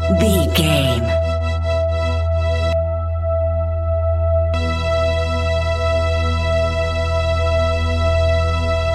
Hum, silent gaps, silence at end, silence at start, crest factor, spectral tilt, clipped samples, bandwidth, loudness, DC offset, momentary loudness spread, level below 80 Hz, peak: none; none; 0 s; 0 s; 14 dB; -6 dB/octave; under 0.1%; 14 kHz; -18 LUFS; under 0.1%; 4 LU; -24 dBFS; -2 dBFS